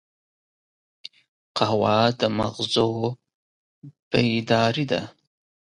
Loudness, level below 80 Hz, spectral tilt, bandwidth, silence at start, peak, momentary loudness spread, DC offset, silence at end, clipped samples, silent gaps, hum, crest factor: -23 LUFS; -56 dBFS; -5.5 dB/octave; 10.5 kHz; 1.55 s; -4 dBFS; 22 LU; under 0.1%; 0.55 s; under 0.1%; 3.34-3.82 s, 4.02-4.11 s; none; 22 dB